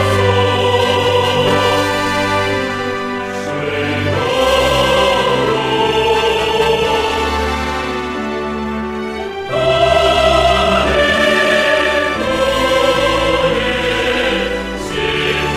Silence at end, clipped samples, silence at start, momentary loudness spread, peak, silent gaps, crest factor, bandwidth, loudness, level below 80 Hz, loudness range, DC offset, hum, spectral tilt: 0 s; under 0.1%; 0 s; 9 LU; 0 dBFS; none; 14 dB; 15.5 kHz; -14 LUFS; -32 dBFS; 4 LU; under 0.1%; none; -4.5 dB/octave